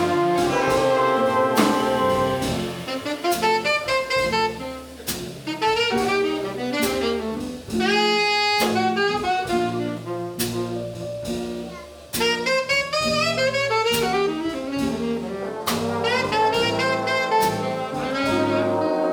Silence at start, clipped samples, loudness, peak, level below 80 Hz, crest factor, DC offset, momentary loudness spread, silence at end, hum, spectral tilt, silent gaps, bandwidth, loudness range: 0 s; under 0.1%; -22 LUFS; -4 dBFS; -50 dBFS; 18 dB; under 0.1%; 10 LU; 0 s; none; -4 dB/octave; none; over 20 kHz; 3 LU